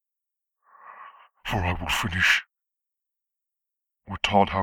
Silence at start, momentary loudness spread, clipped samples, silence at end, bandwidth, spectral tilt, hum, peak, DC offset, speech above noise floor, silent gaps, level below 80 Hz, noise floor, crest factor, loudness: 0.85 s; 20 LU; under 0.1%; 0 s; 19.5 kHz; -4 dB/octave; none; -6 dBFS; under 0.1%; 63 dB; none; -46 dBFS; -86 dBFS; 22 dB; -24 LUFS